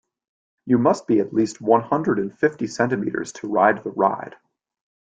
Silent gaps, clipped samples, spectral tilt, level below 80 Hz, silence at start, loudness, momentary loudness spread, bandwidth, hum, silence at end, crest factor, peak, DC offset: none; under 0.1%; -6.5 dB/octave; -62 dBFS; 0.65 s; -21 LUFS; 9 LU; 9.2 kHz; none; 0.9 s; 20 dB; -2 dBFS; under 0.1%